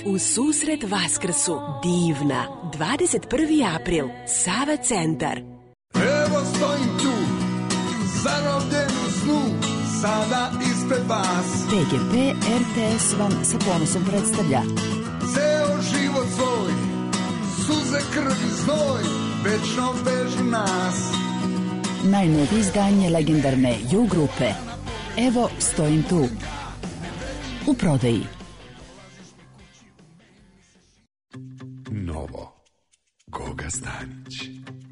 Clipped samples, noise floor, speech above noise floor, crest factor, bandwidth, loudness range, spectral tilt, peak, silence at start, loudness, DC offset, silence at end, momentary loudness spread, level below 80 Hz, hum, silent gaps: under 0.1%; -68 dBFS; 46 dB; 14 dB; 11 kHz; 11 LU; -4.5 dB/octave; -8 dBFS; 0 s; -22 LUFS; under 0.1%; 0 s; 13 LU; -46 dBFS; none; none